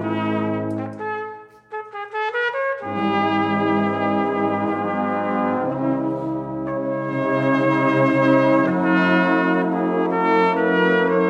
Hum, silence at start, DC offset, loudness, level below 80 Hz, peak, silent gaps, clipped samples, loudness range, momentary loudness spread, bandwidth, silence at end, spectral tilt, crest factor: none; 0 s; under 0.1%; -20 LUFS; -62 dBFS; -6 dBFS; none; under 0.1%; 5 LU; 10 LU; 7.4 kHz; 0 s; -8 dB/octave; 14 dB